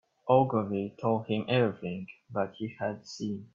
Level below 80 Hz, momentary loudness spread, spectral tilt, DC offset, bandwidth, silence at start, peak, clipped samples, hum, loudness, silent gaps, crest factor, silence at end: -70 dBFS; 12 LU; -7 dB/octave; under 0.1%; 7.6 kHz; 0.25 s; -10 dBFS; under 0.1%; none; -30 LUFS; none; 20 dB; 0.1 s